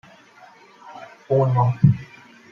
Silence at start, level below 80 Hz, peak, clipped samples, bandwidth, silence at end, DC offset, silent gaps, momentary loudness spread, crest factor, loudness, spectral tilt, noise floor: 0.85 s; -54 dBFS; -2 dBFS; under 0.1%; 6.4 kHz; 0.45 s; under 0.1%; none; 24 LU; 20 dB; -20 LUFS; -10 dB/octave; -49 dBFS